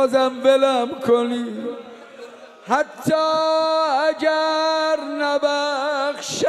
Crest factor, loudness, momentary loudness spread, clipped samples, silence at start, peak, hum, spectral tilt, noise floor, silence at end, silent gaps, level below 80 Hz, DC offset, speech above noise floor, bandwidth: 16 dB; -20 LUFS; 15 LU; under 0.1%; 0 s; -4 dBFS; none; -3.5 dB/octave; -40 dBFS; 0 s; none; -68 dBFS; under 0.1%; 21 dB; 13.5 kHz